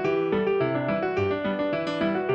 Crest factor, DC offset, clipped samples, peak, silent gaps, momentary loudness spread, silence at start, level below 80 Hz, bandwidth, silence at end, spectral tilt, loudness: 14 dB; under 0.1%; under 0.1%; -12 dBFS; none; 2 LU; 0 s; -58 dBFS; 7.8 kHz; 0 s; -7.5 dB/octave; -26 LUFS